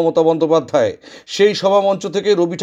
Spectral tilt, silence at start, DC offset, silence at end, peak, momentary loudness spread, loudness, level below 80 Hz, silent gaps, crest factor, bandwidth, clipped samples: -5 dB/octave; 0 s; under 0.1%; 0 s; -2 dBFS; 7 LU; -15 LUFS; -64 dBFS; none; 14 dB; 10 kHz; under 0.1%